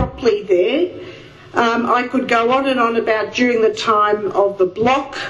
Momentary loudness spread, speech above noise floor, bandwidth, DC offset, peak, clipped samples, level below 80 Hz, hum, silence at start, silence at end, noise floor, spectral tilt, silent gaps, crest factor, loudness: 4 LU; 21 dB; 11.5 kHz; under 0.1%; 0 dBFS; under 0.1%; -46 dBFS; none; 0 s; 0 s; -37 dBFS; -5 dB/octave; none; 16 dB; -16 LUFS